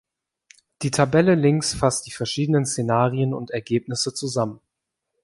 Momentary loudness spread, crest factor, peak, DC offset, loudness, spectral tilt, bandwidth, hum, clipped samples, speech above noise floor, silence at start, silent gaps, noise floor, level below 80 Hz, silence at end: 9 LU; 20 dB; -4 dBFS; under 0.1%; -22 LUFS; -5 dB/octave; 11.5 kHz; none; under 0.1%; 60 dB; 0.8 s; none; -81 dBFS; -52 dBFS; 0.65 s